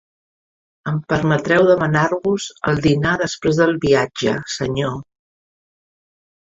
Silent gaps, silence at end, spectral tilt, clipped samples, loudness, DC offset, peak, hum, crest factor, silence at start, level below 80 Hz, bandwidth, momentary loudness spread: none; 1.45 s; -6 dB/octave; under 0.1%; -18 LUFS; under 0.1%; -2 dBFS; none; 18 dB; 0.85 s; -46 dBFS; 7.8 kHz; 10 LU